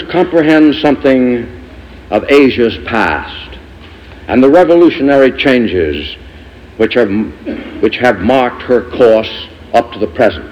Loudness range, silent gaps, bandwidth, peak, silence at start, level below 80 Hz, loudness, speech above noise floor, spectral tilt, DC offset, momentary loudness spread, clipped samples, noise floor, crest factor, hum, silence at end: 3 LU; none; 10.5 kHz; 0 dBFS; 0 s; -36 dBFS; -10 LUFS; 24 dB; -6.5 dB/octave; under 0.1%; 15 LU; under 0.1%; -33 dBFS; 10 dB; none; 0 s